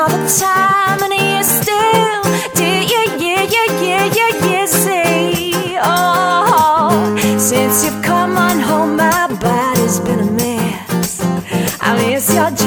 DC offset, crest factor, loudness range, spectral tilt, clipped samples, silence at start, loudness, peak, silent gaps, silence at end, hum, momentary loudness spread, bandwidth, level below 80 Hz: under 0.1%; 14 dB; 3 LU; -3.5 dB/octave; under 0.1%; 0 s; -13 LUFS; 0 dBFS; none; 0 s; none; 5 LU; over 20 kHz; -46 dBFS